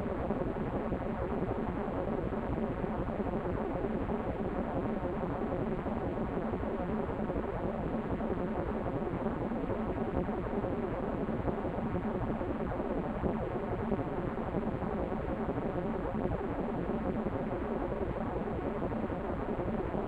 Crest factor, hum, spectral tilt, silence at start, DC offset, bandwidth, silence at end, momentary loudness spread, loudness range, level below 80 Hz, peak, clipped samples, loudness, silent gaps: 18 dB; none; -9.5 dB/octave; 0 s; under 0.1%; 8.4 kHz; 0 s; 1 LU; 0 LU; -44 dBFS; -16 dBFS; under 0.1%; -35 LUFS; none